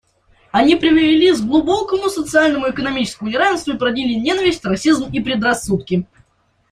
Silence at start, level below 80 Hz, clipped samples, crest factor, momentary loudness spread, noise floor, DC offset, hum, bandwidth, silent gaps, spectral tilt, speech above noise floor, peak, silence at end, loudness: 0.55 s; -46 dBFS; under 0.1%; 14 dB; 8 LU; -60 dBFS; under 0.1%; none; 13.5 kHz; none; -4.5 dB/octave; 45 dB; -2 dBFS; 0.7 s; -16 LUFS